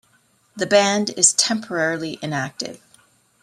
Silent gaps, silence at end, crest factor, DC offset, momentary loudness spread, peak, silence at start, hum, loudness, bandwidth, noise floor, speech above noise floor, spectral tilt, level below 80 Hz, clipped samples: none; 0.65 s; 22 dB; under 0.1%; 14 LU; 0 dBFS; 0.55 s; none; -19 LUFS; 15.5 kHz; -60 dBFS; 40 dB; -2 dB/octave; -66 dBFS; under 0.1%